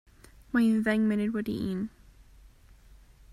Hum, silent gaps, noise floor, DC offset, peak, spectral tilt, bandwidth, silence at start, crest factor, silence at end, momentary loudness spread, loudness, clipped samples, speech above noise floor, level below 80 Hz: none; none; -55 dBFS; under 0.1%; -12 dBFS; -7 dB/octave; 13 kHz; 0.55 s; 18 dB; 0.85 s; 10 LU; -28 LUFS; under 0.1%; 28 dB; -56 dBFS